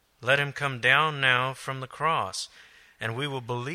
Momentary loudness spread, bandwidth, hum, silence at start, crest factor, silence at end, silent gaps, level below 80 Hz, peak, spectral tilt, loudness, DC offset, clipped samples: 14 LU; 15 kHz; none; 0.2 s; 22 dB; 0 s; none; -66 dBFS; -6 dBFS; -3.5 dB/octave; -26 LUFS; under 0.1%; under 0.1%